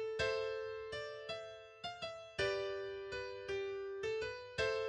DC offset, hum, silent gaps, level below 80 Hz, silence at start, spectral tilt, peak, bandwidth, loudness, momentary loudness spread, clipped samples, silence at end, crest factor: under 0.1%; none; none; -66 dBFS; 0 s; -3.5 dB/octave; -24 dBFS; 10 kHz; -42 LUFS; 9 LU; under 0.1%; 0 s; 18 dB